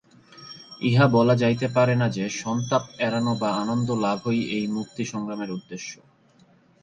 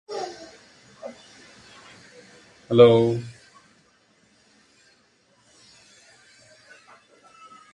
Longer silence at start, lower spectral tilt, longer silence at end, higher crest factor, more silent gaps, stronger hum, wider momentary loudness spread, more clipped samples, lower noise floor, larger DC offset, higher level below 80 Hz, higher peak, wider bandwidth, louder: first, 0.35 s vs 0.1 s; about the same, -6 dB/octave vs -7 dB/octave; second, 0.9 s vs 4.4 s; second, 20 dB vs 26 dB; neither; neither; second, 15 LU vs 32 LU; neither; second, -58 dBFS vs -62 dBFS; neither; about the same, -62 dBFS vs -66 dBFS; about the same, -4 dBFS vs -2 dBFS; about the same, 9.4 kHz vs 9.6 kHz; second, -24 LUFS vs -19 LUFS